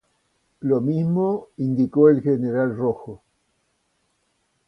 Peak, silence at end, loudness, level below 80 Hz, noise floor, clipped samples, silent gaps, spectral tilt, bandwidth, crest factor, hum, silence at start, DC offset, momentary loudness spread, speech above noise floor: -4 dBFS; 1.5 s; -21 LUFS; -62 dBFS; -70 dBFS; under 0.1%; none; -11 dB/octave; 5.8 kHz; 18 dB; none; 0.6 s; under 0.1%; 11 LU; 50 dB